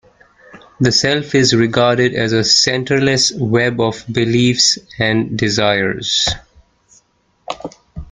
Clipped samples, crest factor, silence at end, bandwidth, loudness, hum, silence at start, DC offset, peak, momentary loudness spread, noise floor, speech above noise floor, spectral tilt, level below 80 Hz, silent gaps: under 0.1%; 16 dB; 0.05 s; 9.6 kHz; -14 LUFS; none; 0.55 s; under 0.1%; 0 dBFS; 13 LU; -57 dBFS; 43 dB; -3.5 dB/octave; -44 dBFS; none